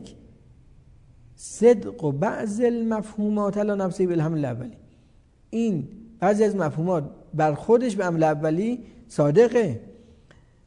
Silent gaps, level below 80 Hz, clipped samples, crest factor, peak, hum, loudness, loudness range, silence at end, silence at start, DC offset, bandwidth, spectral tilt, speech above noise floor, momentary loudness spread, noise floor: none; -56 dBFS; under 0.1%; 18 dB; -6 dBFS; none; -23 LUFS; 4 LU; 0.75 s; 0 s; under 0.1%; 11 kHz; -7.5 dB/octave; 33 dB; 14 LU; -56 dBFS